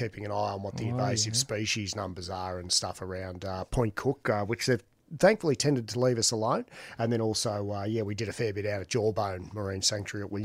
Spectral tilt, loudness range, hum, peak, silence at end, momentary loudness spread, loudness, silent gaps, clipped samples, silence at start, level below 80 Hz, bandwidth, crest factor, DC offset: -4 dB/octave; 3 LU; none; -10 dBFS; 0 s; 11 LU; -30 LUFS; none; under 0.1%; 0 s; -54 dBFS; 16 kHz; 20 dB; under 0.1%